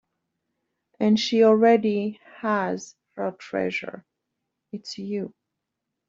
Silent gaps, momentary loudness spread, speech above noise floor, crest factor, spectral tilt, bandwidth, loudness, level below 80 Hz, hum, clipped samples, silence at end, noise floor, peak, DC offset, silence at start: none; 20 LU; 60 dB; 20 dB; -5.5 dB/octave; 7.6 kHz; -23 LUFS; -72 dBFS; none; under 0.1%; 0.8 s; -83 dBFS; -6 dBFS; under 0.1%; 1 s